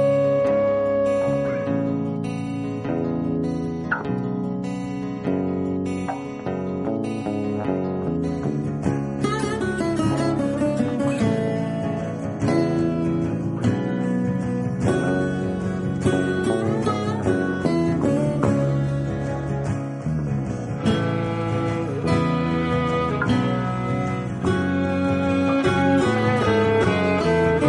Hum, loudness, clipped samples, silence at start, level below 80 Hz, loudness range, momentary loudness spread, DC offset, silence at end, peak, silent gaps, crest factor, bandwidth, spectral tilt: none; -23 LUFS; under 0.1%; 0 s; -44 dBFS; 5 LU; 7 LU; under 0.1%; 0 s; -6 dBFS; none; 16 dB; 11.5 kHz; -7.5 dB/octave